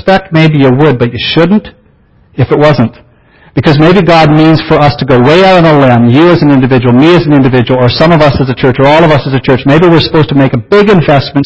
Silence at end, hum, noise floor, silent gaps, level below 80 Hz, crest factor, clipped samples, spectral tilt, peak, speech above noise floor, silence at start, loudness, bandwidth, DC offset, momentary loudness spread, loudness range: 0 s; none; -44 dBFS; none; -32 dBFS; 6 dB; 4%; -8 dB/octave; 0 dBFS; 39 dB; 0.05 s; -6 LUFS; 8 kHz; under 0.1%; 5 LU; 4 LU